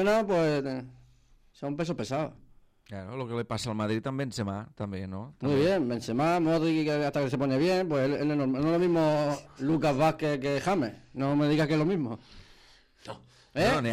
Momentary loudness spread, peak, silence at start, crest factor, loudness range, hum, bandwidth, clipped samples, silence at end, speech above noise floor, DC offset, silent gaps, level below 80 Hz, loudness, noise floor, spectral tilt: 13 LU; -14 dBFS; 0 s; 14 dB; 7 LU; none; 15 kHz; under 0.1%; 0 s; 32 dB; under 0.1%; none; -58 dBFS; -28 LUFS; -60 dBFS; -6.5 dB/octave